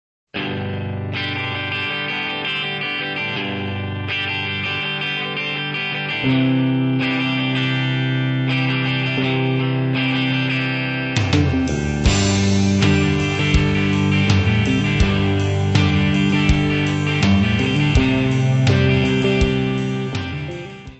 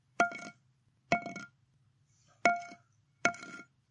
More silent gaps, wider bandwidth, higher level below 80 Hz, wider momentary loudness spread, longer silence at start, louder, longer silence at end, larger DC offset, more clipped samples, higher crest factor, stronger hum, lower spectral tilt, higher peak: neither; second, 8.4 kHz vs 11 kHz; first, -32 dBFS vs -76 dBFS; second, 7 LU vs 20 LU; first, 0.35 s vs 0.2 s; first, -19 LUFS vs -33 LUFS; second, 0.05 s vs 0.3 s; neither; neither; second, 16 dB vs 28 dB; neither; first, -5.5 dB/octave vs -3.5 dB/octave; first, -2 dBFS vs -10 dBFS